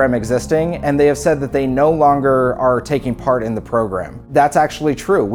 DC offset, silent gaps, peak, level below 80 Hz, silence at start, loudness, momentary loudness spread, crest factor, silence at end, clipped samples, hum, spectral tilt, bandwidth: under 0.1%; none; -2 dBFS; -38 dBFS; 0 s; -16 LUFS; 6 LU; 14 dB; 0 s; under 0.1%; none; -6.5 dB/octave; 17.5 kHz